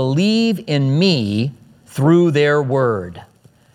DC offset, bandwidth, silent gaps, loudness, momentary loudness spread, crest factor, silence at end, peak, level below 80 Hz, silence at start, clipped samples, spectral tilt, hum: under 0.1%; 13.5 kHz; none; -16 LUFS; 12 LU; 16 dB; 0.5 s; -2 dBFS; -60 dBFS; 0 s; under 0.1%; -7 dB/octave; none